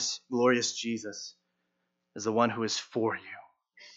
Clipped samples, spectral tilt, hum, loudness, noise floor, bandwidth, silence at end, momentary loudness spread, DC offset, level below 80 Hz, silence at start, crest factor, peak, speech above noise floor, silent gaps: under 0.1%; -3 dB/octave; none; -30 LUFS; -80 dBFS; 8.2 kHz; 0.05 s; 19 LU; under 0.1%; -84 dBFS; 0 s; 20 dB; -12 dBFS; 50 dB; none